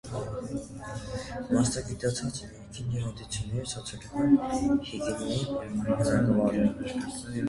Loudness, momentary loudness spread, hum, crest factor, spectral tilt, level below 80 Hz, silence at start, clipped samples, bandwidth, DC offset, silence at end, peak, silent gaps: -30 LUFS; 13 LU; none; 18 dB; -6 dB/octave; -48 dBFS; 0.05 s; under 0.1%; 11.5 kHz; under 0.1%; 0 s; -10 dBFS; none